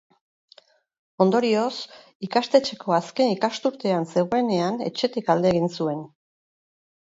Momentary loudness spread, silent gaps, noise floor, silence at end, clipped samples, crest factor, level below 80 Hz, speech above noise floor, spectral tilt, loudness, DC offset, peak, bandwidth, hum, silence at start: 8 LU; 2.15-2.20 s; -56 dBFS; 0.95 s; under 0.1%; 20 dB; -64 dBFS; 33 dB; -6 dB/octave; -23 LUFS; under 0.1%; -4 dBFS; 7.8 kHz; none; 1.2 s